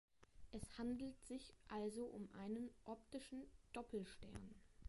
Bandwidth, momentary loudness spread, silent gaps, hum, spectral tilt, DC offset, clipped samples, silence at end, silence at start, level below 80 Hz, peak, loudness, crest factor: 11.5 kHz; 10 LU; none; none; -5.5 dB/octave; under 0.1%; under 0.1%; 0 s; 0.2 s; -68 dBFS; -36 dBFS; -52 LUFS; 16 dB